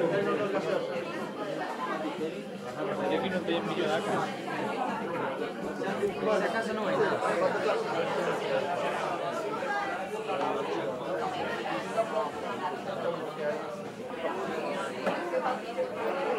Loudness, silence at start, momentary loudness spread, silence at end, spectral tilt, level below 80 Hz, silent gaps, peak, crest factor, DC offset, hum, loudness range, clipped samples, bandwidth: -32 LUFS; 0 s; 6 LU; 0 s; -5 dB/octave; -74 dBFS; none; -16 dBFS; 16 dB; under 0.1%; none; 4 LU; under 0.1%; 16 kHz